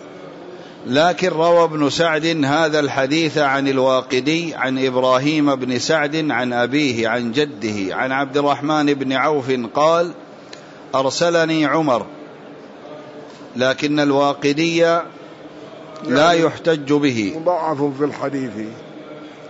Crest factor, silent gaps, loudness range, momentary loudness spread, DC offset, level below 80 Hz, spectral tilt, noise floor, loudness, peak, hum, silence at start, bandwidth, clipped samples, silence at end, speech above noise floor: 14 dB; none; 3 LU; 21 LU; under 0.1%; -64 dBFS; -5 dB/octave; -38 dBFS; -18 LUFS; -4 dBFS; none; 0 s; 8 kHz; under 0.1%; 0 s; 21 dB